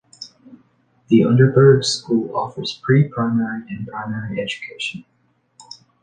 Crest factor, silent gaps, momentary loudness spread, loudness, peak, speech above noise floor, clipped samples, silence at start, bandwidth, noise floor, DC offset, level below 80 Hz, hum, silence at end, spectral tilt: 18 dB; none; 17 LU; -18 LUFS; -2 dBFS; 41 dB; under 0.1%; 0.2 s; 9.6 kHz; -59 dBFS; under 0.1%; -56 dBFS; none; 1 s; -6.5 dB/octave